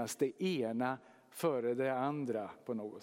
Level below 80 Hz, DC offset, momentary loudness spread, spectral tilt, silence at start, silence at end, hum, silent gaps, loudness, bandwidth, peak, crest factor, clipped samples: -86 dBFS; under 0.1%; 8 LU; -5.5 dB/octave; 0 s; 0 s; none; none; -37 LUFS; 16.5 kHz; -20 dBFS; 16 dB; under 0.1%